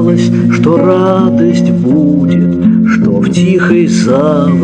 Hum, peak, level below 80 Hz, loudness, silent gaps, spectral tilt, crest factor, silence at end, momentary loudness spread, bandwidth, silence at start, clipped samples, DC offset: none; 0 dBFS; -44 dBFS; -9 LUFS; none; -7.5 dB/octave; 8 dB; 0 s; 1 LU; 9.4 kHz; 0 s; 0.3%; under 0.1%